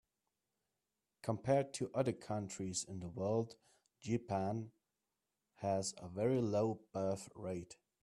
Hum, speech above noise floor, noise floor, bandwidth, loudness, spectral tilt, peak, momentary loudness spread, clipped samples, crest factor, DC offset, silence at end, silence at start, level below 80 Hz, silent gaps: none; 51 dB; -90 dBFS; 13 kHz; -40 LUFS; -6 dB/octave; -22 dBFS; 11 LU; under 0.1%; 20 dB; under 0.1%; 0.3 s; 1.25 s; -74 dBFS; none